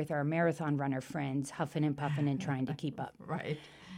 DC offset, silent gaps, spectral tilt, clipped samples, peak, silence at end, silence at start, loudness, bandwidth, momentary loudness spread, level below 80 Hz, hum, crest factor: under 0.1%; none; -7 dB/octave; under 0.1%; -20 dBFS; 0 s; 0 s; -35 LUFS; 15 kHz; 8 LU; -70 dBFS; none; 16 dB